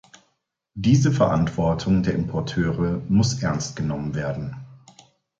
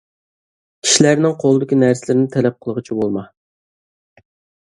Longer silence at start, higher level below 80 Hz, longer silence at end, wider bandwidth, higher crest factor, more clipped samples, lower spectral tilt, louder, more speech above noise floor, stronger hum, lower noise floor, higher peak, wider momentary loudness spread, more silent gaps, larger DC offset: about the same, 0.75 s vs 0.85 s; first, -44 dBFS vs -60 dBFS; second, 0.65 s vs 1.4 s; second, 8 kHz vs 11.5 kHz; about the same, 18 dB vs 18 dB; neither; first, -6.5 dB/octave vs -4.5 dB/octave; second, -22 LUFS vs -16 LUFS; second, 51 dB vs over 75 dB; neither; second, -73 dBFS vs under -90 dBFS; second, -6 dBFS vs 0 dBFS; about the same, 10 LU vs 11 LU; neither; neither